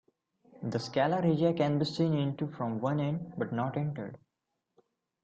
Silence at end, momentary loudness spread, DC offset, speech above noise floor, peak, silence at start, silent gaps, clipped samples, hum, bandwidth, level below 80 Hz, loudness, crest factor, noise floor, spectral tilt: 1.05 s; 9 LU; under 0.1%; 54 dB; -14 dBFS; 0.55 s; none; under 0.1%; none; 8 kHz; -68 dBFS; -31 LUFS; 18 dB; -84 dBFS; -7.5 dB/octave